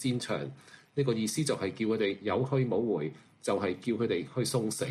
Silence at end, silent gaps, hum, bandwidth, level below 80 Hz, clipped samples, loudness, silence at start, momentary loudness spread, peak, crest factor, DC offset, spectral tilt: 0 s; none; none; 14.5 kHz; -68 dBFS; under 0.1%; -31 LUFS; 0 s; 7 LU; -16 dBFS; 14 dB; under 0.1%; -5.5 dB/octave